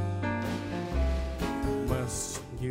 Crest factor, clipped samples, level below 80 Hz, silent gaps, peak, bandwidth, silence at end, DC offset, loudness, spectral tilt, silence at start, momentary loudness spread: 14 dB; under 0.1%; -36 dBFS; none; -16 dBFS; 16 kHz; 0 s; under 0.1%; -32 LUFS; -5.5 dB/octave; 0 s; 3 LU